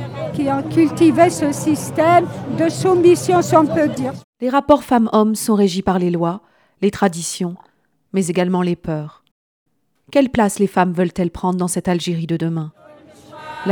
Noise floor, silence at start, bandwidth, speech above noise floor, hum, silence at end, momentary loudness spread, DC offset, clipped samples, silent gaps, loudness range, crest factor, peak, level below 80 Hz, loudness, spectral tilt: -43 dBFS; 0 s; 19.5 kHz; 27 dB; none; 0 s; 12 LU; under 0.1%; under 0.1%; 4.24-4.33 s, 9.31-9.66 s; 6 LU; 18 dB; 0 dBFS; -50 dBFS; -17 LUFS; -6 dB/octave